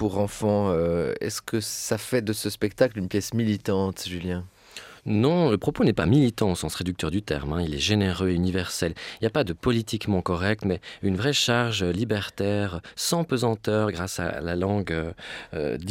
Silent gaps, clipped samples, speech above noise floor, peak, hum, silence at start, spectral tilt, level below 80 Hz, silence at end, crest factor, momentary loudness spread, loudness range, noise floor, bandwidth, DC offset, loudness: none; under 0.1%; 20 dB; -6 dBFS; none; 0 s; -5 dB/octave; -46 dBFS; 0 s; 18 dB; 8 LU; 3 LU; -45 dBFS; 17 kHz; under 0.1%; -25 LUFS